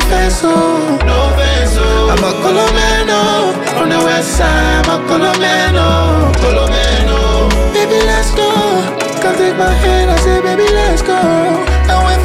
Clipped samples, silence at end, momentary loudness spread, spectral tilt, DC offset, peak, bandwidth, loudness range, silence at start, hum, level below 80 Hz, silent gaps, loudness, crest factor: under 0.1%; 0 s; 2 LU; -4.5 dB/octave; under 0.1%; -2 dBFS; 15 kHz; 1 LU; 0 s; none; -16 dBFS; none; -11 LUFS; 8 dB